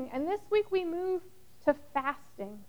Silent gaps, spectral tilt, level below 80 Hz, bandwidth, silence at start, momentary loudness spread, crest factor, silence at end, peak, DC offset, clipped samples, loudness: none; -6 dB/octave; -64 dBFS; over 20 kHz; 0 s; 8 LU; 18 dB; 0.05 s; -14 dBFS; 0.3%; under 0.1%; -32 LUFS